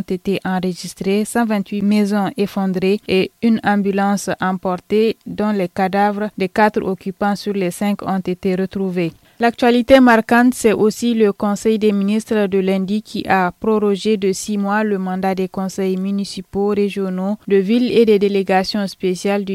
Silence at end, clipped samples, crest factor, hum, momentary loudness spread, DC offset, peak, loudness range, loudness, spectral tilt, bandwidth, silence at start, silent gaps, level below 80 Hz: 0 s; under 0.1%; 16 dB; none; 8 LU; under 0.1%; 0 dBFS; 5 LU; -17 LUFS; -6 dB/octave; 14.5 kHz; 0 s; none; -50 dBFS